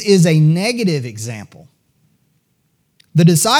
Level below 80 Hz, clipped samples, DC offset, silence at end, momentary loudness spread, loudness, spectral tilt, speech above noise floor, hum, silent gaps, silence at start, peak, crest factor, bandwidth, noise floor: -66 dBFS; under 0.1%; under 0.1%; 0 s; 16 LU; -14 LUFS; -5 dB/octave; 50 dB; none; none; 0 s; 0 dBFS; 14 dB; 18 kHz; -63 dBFS